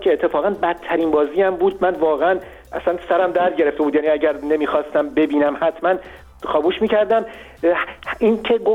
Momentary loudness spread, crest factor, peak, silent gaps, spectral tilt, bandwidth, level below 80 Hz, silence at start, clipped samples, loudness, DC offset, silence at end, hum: 6 LU; 12 dB; -6 dBFS; none; -6.5 dB/octave; 7.6 kHz; -50 dBFS; 0 s; under 0.1%; -19 LUFS; under 0.1%; 0 s; none